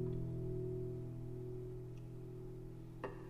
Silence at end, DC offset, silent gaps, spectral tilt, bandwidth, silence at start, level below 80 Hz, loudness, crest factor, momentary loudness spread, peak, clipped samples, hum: 0 s; under 0.1%; none; -9.5 dB/octave; 12 kHz; 0 s; -56 dBFS; -47 LUFS; 14 dB; 8 LU; -32 dBFS; under 0.1%; none